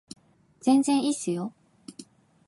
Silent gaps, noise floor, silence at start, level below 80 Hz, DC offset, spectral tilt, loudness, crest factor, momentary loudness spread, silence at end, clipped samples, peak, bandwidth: none; -51 dBFS; 0.65 s; -78 dBFS; under 0.1%; -4.5 dB/octave; -25 LUFS; 18 dB; 24 LU; 0.45 s; under 0.1%; -10 dBFS; 11.5 kHz